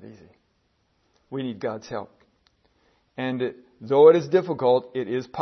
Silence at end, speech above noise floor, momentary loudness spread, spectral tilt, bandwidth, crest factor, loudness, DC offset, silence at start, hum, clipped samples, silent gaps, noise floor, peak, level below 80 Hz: 0 s; 47 dB; 20 LU; -7 dB/octave; 6.4 kHz; 22 dB; -22 LUFS; under 0.1%; 0.05 s; none; under 0.1%; none; -69 dBFS; -4 dBFS; -70 dBFS